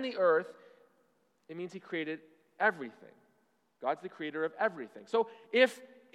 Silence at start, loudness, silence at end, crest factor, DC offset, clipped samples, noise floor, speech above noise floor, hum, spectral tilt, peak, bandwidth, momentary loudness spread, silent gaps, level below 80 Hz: 0 s; -33 LUFS; 0.3 s; 24 dB; under 0.1%; under 0.1%; -74 dBFS; 41 dB; none; -4.5 dB/octave; -12 dBFS; 13 kHz; 18 LU; none; under -90 dBFS